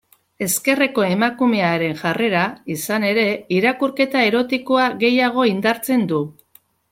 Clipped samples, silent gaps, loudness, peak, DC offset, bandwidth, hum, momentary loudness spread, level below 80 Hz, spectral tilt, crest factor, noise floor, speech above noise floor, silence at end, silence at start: under 0.1%; none; -18 LUFS; -2 dBFS; under 0.1%; 16.5 kHz; none; 6 LU; -62 dBFS; -4.5 dB/octave; 16 dB; -55 dBFS; 37 dB; 0.6 s; 0.4 s